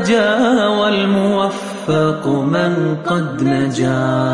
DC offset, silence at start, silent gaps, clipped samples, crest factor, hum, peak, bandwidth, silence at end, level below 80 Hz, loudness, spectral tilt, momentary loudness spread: 0.1%; 0 s; none; under 0.1%; 12 dB; none; -2 dBFS; 11.5 kHz; 0 s; -54 dBFS; -16 LUFS; -6 dB/octave; 5 LU